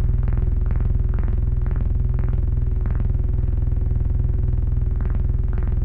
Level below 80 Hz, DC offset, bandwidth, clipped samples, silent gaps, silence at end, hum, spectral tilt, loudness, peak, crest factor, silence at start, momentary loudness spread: -20 dBFS; under 0.1%; 2.7 kHz; under 0.1%; none; 0 s; none; -11.5 dB/octave; -23 LUFS; -10 dBFS; 8 dB; 0 s; 1 LU